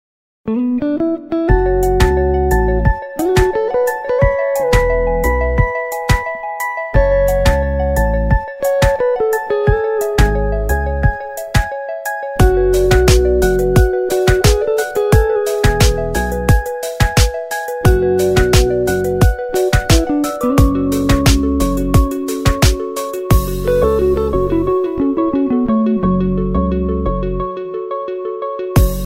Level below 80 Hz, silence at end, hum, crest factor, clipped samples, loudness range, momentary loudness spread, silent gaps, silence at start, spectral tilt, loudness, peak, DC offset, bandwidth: -20 dBFS; 0 s; none; 14 dB; under 0.1%; 3 LU; 8 LU; none; 0.45 s; -6 dB/octave; -15 LUFS; 0 dBFS; under 0.1%; 16.5 kHz